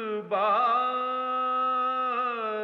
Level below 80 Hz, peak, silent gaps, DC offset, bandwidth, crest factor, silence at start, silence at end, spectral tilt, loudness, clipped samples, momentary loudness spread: under -90 dBFS; -16 dBFS; none; under 0.1%; 5.8 kHz; 12 dB; 0 s; 0 s; -6 dB/octave; -26 LUFS; under 0.1%; 5 LU